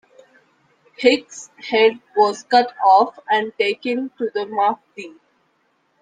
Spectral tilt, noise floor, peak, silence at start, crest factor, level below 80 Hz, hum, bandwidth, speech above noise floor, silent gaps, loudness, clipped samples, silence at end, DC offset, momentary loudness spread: -3 dB/octave; -65 dBFS; -2 dBFS; 1 s; 18 dB; -70 dBFS; none; 9.4 kHz; 46 dB; none; -18 LUFS; under 0.1%; 0.9 s; under 0.1%; 18 LU